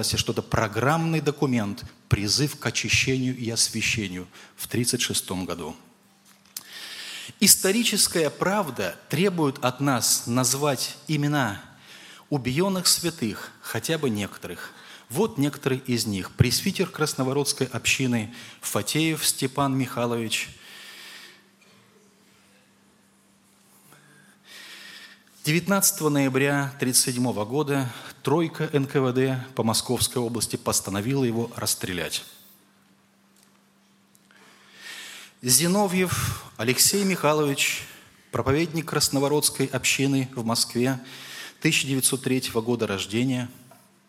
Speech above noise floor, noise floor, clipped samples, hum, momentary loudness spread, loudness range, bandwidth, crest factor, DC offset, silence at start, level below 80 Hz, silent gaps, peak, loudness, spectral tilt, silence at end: 36 dB; -60 dBFS; under 0.1%; none; 17 LU; 6 LU; 16.5 kHz; 24 dB; under 0.1%; 0 s; -54 dBFS; none; -2 dBFS; -24 LUFS; -3.5 dB/octave; 0.45 s